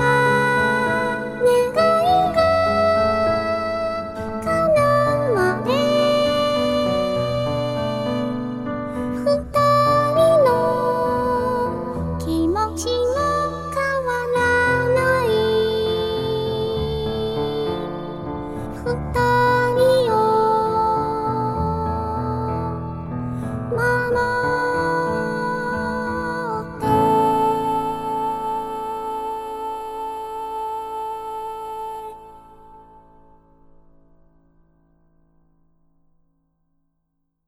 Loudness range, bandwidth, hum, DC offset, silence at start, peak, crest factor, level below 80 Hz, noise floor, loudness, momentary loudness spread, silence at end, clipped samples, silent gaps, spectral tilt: 10 LU; 15 kHz; none; under 0.1%; 0 s; -6 dBFS; 16 dB; -42 dBFS; -72 dBFS; -20 LUFS; 12 LU; 4.65 s; under 0.1%; none; -5.5 dB/octave